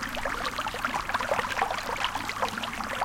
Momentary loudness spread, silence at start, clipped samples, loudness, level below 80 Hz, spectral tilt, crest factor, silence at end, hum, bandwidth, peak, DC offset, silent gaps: 3 LU; 0 s; under 0.1%; -30 LUFS; -48 dBFS; -2.5 dB/octave; 22 dB; 0 s; none; 17 kHz; -10 dBFS; under 0.1%; none